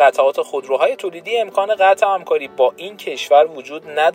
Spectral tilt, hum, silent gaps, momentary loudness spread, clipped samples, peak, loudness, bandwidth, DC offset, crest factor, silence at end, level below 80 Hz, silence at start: -2.5 dB/octave; none; none; 12 LU; under 0.1%; 0 dBFS; -17 LUFS; 16 kHz; under 0.1%; 16 dB; 0 s; -76 dBFS; 0 s